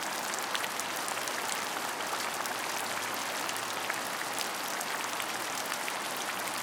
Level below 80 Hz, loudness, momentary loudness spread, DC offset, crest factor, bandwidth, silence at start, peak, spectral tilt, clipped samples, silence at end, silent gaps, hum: -86 dBFS; -33 LUFS; 1 LU; under 0.1%; 24 dB; 19 kHz; 0 s; -10 dBFS; -0.5 dB/octave; under 0.1%; 0 s; none; none